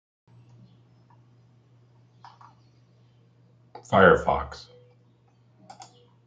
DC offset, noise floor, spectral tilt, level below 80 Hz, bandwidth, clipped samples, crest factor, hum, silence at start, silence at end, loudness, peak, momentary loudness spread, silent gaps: under 0.1%; -60 dBFS; -6.5 dB/octave; -52 dBFS; 7.8 kHz; under 0.1%; 26 dB; none; 3.9 s; 0.45 s; -21 LUFS; -4 dBFS; 31 LU; none